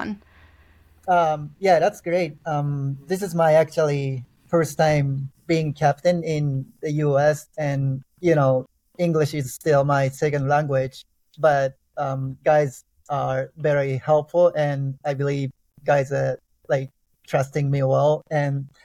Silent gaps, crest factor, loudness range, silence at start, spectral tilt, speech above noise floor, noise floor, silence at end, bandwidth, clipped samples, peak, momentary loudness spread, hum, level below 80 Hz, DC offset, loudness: none; 16 dB; 2 LU; 0 s; -7 dB/octave; 33 dB; -54 dBFS; 0.15 s; 14.5 kHz; under 0.1%; -6 dBFS; 9 LU; none; -56 dBFS; under 0.1%; -22 LUFS